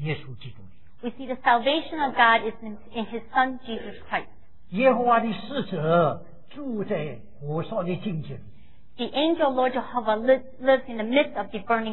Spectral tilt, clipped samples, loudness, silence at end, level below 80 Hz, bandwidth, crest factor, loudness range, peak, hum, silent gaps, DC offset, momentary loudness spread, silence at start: -9 dB/octave; under 0.1%; -25 LUFS; 0 s; -58 dBFS; 4.2 kHz; 20 dB; 4 LU; -6 dBFS; none; none; 1%; 16 LU; 0 s